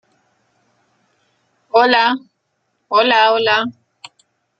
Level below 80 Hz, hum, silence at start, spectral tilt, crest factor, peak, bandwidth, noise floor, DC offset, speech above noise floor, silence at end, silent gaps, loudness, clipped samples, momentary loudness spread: -68 dBFS; none; 1.75 s; -3.5 dB/octave; 18 dB; 0 dBFS; 8.6 kHz; -69 dBFS; under 0.1%; 55 dB; 0.9 s; none; -14 LUFS; under 0.1%; 8 LU